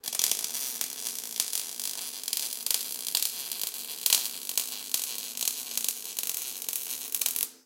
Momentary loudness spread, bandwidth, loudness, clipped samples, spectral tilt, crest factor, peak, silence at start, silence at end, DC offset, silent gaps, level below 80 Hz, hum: 6 LU; 17.5 kHz; -29 LUFS; under 0.1%; 3 dB/octave; 30 dB; -2 dBFS; 0.05 s; 0.05 s; under 0.1%; none; under -90 dBFS; none